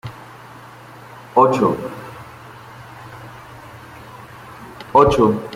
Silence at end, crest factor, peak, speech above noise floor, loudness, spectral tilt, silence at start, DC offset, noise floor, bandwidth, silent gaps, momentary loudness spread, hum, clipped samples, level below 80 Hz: 0 s; 20 dB; -2 dBFS; 25 dB; -16 LUFS; -7 dB/octave; 0.05 s; under 0.1%; -40 dBFS; 16 kHz; none; 25 LU; none; under 0.1%; -44 dBFS